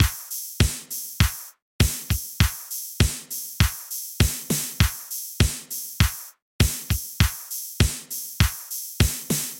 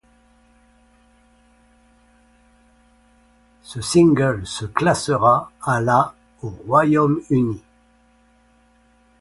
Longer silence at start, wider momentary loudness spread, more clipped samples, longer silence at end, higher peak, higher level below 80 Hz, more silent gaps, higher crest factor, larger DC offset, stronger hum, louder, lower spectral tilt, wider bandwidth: second, 0 s vs 3.7 s; second, 9 LU vs 18 LU; neither; second, 0 s vs 1.6 s; about the same, -2 dBFS vs -2 dBFS; first, -30 dBFS vs -50 dBFS; first, 1.62-1.79 s, 6.42-6.59 s vs none; about the same, 22 dB vs 20 dB; neither; neither; second, -25 LUFS vs -18 LUFS; second, -3.5 dB/octave vs -6 dB/octave; first, 17 kHz vs 11.5 kHz